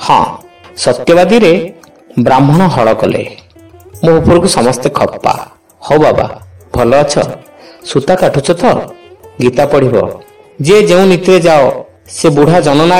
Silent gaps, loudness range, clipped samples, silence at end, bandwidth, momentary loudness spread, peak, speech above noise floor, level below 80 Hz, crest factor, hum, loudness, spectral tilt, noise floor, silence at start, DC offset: none; 3 LU; 0.3%; 0 s; 16 kHz; 13 LU; 0 dBFS; 29 dB; -36 dBFS; 10 dB; none; -9 LUFS; -5.5 dB/octave; -37 dBFS; 0 s; 1%